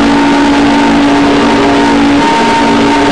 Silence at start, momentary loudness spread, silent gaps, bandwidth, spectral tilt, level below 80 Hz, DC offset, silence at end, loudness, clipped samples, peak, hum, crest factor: 0 s; 0 LU; none; 10.5 kHz; -4.5 dB/octave; -30 dBFS; 3%; 0 s; -7 LUFS; under 0.1%; -2 dBFS; none; 4 dB